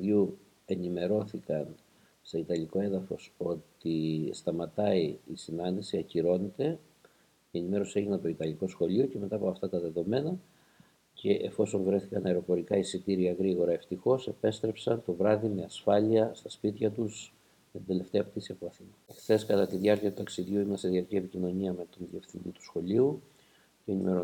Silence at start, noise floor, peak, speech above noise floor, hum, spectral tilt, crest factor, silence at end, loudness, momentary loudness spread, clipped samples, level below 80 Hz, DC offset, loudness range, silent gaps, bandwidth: 0 s; -64 dBFS; -12 dBFS; 33 dB; none; -7 dB/octave; 20 dB; 0 s; -31 LUFS; 13 LU; under 0.1%; -68 dBFS; under 0.1%; 4 LU; none; 17.5 kHz